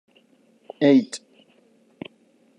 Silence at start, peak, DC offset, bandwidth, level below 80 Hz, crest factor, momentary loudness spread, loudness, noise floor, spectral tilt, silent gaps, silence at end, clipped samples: 0.8 s; -6 dBFS; under 0.1%; 10.5 kHz; -78 dBFS; 20 dB; 24 LU; -20 LUFS; -60 dBFS; -6 dB/octave; none; 1.4 s; under 0.1%